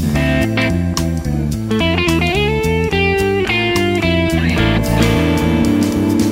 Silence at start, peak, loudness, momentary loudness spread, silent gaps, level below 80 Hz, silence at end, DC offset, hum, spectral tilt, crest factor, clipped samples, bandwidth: 0 s; 0 dBFS; -15 LUFS; 4 LU; none; -26 dBFS; 0 s; under 0.1%; none; -6 dB/octave; 14 dB; under 0.1%; 16.5 kHz